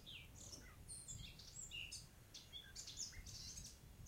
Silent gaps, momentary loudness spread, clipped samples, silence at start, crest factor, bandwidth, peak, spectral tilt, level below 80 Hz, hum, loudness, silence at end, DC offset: none; 7 LU; under 0.1%; 0 s; 18 dB; 16 kHz; -36 dBFS; -1.5 dB/octave; -64 dBFS; none; -53 LUFS; 0 s; under 0.1%